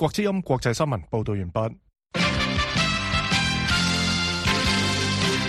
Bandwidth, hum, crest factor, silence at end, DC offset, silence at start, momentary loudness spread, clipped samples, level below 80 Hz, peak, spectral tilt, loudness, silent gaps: 13 kHz; none; 16 dB; 0 s; under 0.1%; 0 s; 7 LU; under 0.1%; -38 dBFS; -8 dBFS; -4 dB/octave; -23 LUFS; none